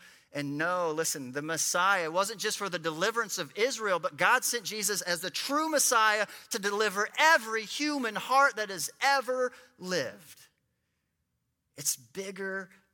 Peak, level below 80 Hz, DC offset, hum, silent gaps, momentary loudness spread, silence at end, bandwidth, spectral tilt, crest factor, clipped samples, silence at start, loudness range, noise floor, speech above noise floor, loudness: -10 dBFS; -82 dBFS; under 0.1%; none; none; 11 LU; 0.25 s; 17.5 kHz; -1.5 dB/octave; 22 dB; under 0.1%; 0.05 s; 7 LU; -80 dBFS; 50 dB; -29 LUFS